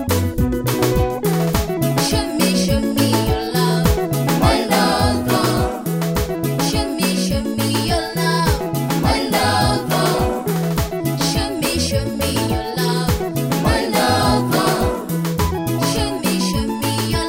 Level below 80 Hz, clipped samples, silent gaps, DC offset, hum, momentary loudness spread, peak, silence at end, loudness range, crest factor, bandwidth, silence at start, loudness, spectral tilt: -30 dBFS; under 0.1%; none; under 0.1%; none; 4 LU; 0 dBFS; 0 s; 2 LU; 16 dB; 16.5 kHz; 0 s; -18 LUFS; -5 dB/octave